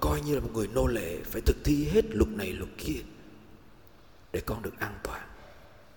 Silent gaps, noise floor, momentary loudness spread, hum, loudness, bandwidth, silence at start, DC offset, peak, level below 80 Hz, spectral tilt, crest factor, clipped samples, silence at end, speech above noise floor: none; -56 dBFS; 15 LU; none; -31 LUFS; 18 kHz; 0 s; 0.2%; -10 dBFS; -38 dBFS; -6 dB/octave; 20 dB; under 0.1%; 0.3 s; 27 dB